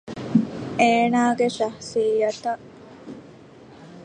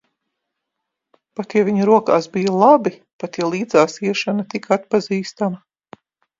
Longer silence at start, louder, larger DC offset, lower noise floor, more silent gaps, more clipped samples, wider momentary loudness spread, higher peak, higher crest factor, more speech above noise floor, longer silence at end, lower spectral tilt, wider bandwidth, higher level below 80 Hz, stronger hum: second, 0.05 s vs 1.4 s; second, -22 LUFS vs -18 LUFS; neither; second, -46 dBFS vs -80 dBFS; second, none vs 3.13-3.19 s; neither; first, 22 LU vs 14 LU; second, -4 dBFS vs 0 dBFS; about the same, 20 dB vs 18 dB; second, 25 dB vs 62 dB; second, 0 s vs 0.85 s; about the same, -5.5 dB/octave vs -6 dB/octave; first, 9.8 kHz vs 7.8 kHz; about the same, -62 dBFS vs -66 dBFS; neither